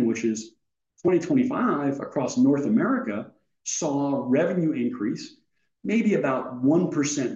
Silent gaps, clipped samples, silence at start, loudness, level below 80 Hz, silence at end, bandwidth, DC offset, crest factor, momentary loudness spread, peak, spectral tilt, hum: none; under 0.1%; 0 s; -24 LUFS; -74 dBFS; 0 s; 8.2 kHz; under 0.1%; 14 dB; 12 LU; -10 dBFS; -5.5 dB/octave; none